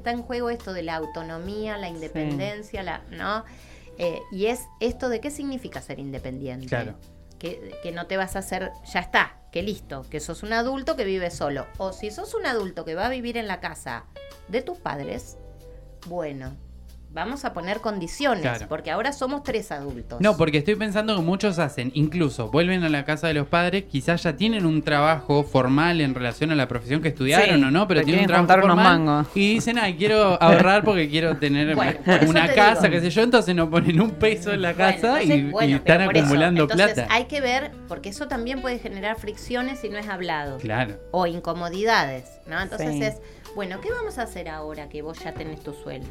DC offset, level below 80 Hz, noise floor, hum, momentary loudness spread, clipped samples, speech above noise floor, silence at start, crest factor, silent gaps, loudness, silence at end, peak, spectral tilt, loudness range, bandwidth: under 0.1%; -46 dBFS; -43 dBFS; none; 17 LU; under 0.1%; 21 dB; 0 s; 20 dB; none; -22 LUFS; 0 s; -2 dBFS; -5.5 dB/octave; 13 LU; 15.5 kHz